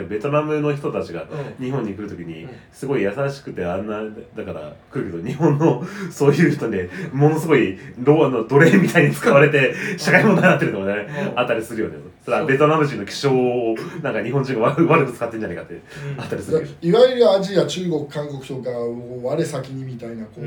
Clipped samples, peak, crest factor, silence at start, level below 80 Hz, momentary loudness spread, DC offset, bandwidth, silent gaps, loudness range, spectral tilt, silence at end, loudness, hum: under 0.1%; 0 dBFS; 18 dB; 0 s; -58 dBFS; 17 LU; under 0.1%; 19 kHz; none; 10 LU; -6.5 dB/octave; 0 s; -19 LUFS; none